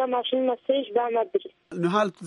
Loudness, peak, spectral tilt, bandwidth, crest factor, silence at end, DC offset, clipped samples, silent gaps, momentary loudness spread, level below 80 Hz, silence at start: -26 LUFS; -10 dBFS; -6 dB/octave; 10.5 kHz; 16 dB; 0 s; under 0.1%; under 0.1%; none; 5 LU; -76 dBFS; 0 s